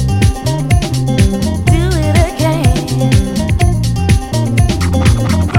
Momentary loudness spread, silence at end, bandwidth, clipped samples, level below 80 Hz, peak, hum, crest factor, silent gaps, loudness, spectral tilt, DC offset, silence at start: 2 LU; 0 s; 16.5 kHz; under 0.1%; -18 dBFS; 0 dBFS; none; 12 dB; none; -13 LUFS; -6 dB/octave; under 0.1%; 0 s